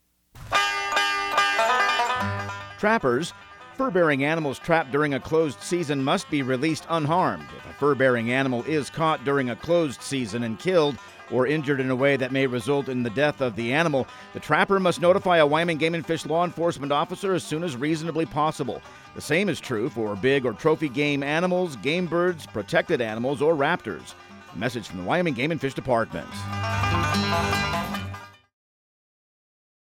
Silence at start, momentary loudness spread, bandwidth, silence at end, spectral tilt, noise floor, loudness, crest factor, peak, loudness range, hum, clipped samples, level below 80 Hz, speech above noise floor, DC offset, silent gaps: 0.35 s; 10 LU; 16.5 kHz; 1.65 s; -5 dB/octave; -45 dBFS; -24 LUFS; 20 dB; -6 dBFS; 4 LU; none; under 0.1%; -54 dBFS; 21 dB; under 0.1%; none